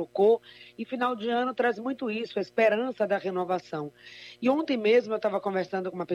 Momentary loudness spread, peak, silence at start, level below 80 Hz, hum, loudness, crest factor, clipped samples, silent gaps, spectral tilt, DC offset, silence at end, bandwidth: 13 LU; -12 dBFS; 0 s; -78 dBFS; none; -28 LUFS; 16 dB; under 0.1%; none; -6.5 dB/octave; under 0.1%; 0 s; 8.4 kHz